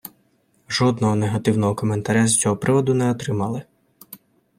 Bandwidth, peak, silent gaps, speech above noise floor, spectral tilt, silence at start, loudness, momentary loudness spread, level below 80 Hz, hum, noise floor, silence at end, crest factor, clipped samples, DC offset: 16 kHz; -4 dBFS; none; 43 dB; -5 dB/octave; 0.05 s; -20 LUFS; 9 LU; -56 dBFS; none; -62 dBFS; 0.4 s; 16 dB; under 0.1%; under 0.1%